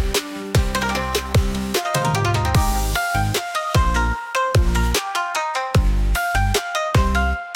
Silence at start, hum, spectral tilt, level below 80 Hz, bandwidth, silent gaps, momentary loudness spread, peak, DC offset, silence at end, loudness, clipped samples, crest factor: 0 s; none; -4.5 dB/octave; -24 dBFS; 17 kHz; none; 4 LU; -6 dBFS; under 0.1%; 0 s; -20 LUFS; under 0.1%; 14 dB